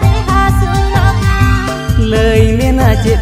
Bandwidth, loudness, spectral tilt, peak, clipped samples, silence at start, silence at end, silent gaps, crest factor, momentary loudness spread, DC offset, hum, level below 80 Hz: 15.5 kHz; -11 LUFS; -6.5 dB/octave; 0 dBFS; 0.4%; 0 s; 0 s; none; 10 dB; 3 LU; under 0.1%; none; -16 dBFS